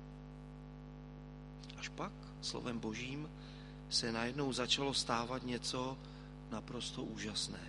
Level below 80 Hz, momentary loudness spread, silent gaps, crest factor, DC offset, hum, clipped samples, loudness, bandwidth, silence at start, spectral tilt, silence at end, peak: -58 dBFS; 18 LU; none; 22 dB; under 0.1%; 50 Hz at -55 dBFS; under 0.1%; -40 LUFS; 11.5 kHz; 0 s; -3.5 dB/octave; 0 s; -20 dBFS